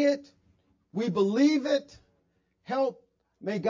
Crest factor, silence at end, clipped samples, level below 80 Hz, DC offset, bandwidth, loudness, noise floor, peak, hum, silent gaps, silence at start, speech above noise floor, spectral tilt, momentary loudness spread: 16 dB; 0 s; under 0.1%; -72 dBFS; under 0.1%; 7.6 kHz; -28 LUFS; -73 dBFS; -14 dBFS; none; none; 0 s; 46 dB; -6 dB/octave; 11 LU